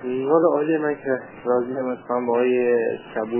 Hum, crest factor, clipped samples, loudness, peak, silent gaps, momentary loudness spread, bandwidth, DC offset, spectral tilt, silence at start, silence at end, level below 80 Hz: none; 16 dB; under 0.1%; -22 LUFS; -6 dBFS; none; 8 LU; 3.2 kHz; under 0.1%; -10.5 dB/octave; 0 s; 0 s; -66 dBFS